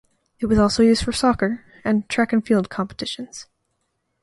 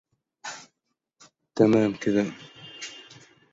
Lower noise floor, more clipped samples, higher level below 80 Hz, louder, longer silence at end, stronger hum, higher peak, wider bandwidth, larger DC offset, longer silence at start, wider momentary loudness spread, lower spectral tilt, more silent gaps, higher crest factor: second, -73 dBFS vs -80 dBFS; neither; first, -42 dBFS vs -64 dBFS; first, -20 LUFS vs -23 LUFS; first, 0.8 s vs 0.5 s; neither; about the same, -4 dBFS vs -6 dBFS; first, 11.5 kHz vs 7.8 kHz; neither; about the same, 0.4 s vs 0.45 s; second, 13 LU vs 23 LU; about the same, -5 dB/octave vs -6 dB/octave; neither; second, 16 dB vs 22 dB